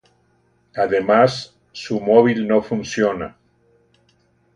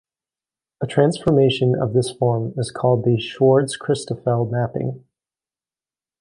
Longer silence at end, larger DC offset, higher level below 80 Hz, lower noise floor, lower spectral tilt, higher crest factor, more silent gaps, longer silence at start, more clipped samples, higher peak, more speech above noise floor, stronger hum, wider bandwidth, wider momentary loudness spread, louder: about the same, 1.25 s vs 1.25 s; neither; about the same, -56 dBFS vs -54 dBFS; second, -61 dBFS vs under -90 dBFS; about the same, -6 dB/octave vs -6.5 dB/octave; about the same, 20 dB vs 18 dB; neither; about the same, 0.75 s vs 0.8 s; neither; about the same, 0 dBFS vs -2 dBFS; second, 44 dB vs over 71 dB; neither; about the same, 10 kHz vs 11 kHz; first, 19 LU vs 9 LU; about the same, -18 LUFS vs -20 LUFS